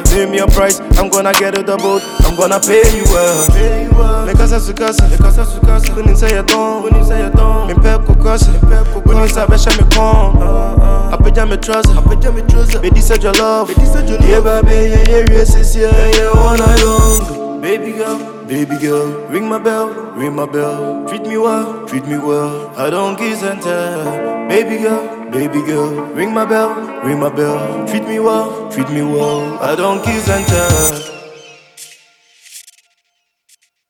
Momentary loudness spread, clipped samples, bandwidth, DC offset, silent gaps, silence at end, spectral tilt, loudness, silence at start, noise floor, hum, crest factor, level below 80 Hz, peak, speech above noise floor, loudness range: 9 LU; 0.1%; 19.5 kHz; under 0.1%; none; 1.3 s; -5 dB/octave; -13 LUFS; 0 s; -66 dBFS; none; 10 dB; -12 dBFS; 0 dBFS; 56 dB; 6 LU